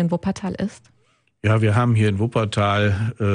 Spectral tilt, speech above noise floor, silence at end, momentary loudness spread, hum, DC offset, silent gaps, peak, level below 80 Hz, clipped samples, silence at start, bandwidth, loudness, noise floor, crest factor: -7 dB/octave; 43 dB; 0 s; 9 LU; none; under 0.1%; none; -6 dBFS; -50 dBFS; under 0.1%; 0 s; 10 kHz; -21 LUFS; -62 dBFS; 14 dB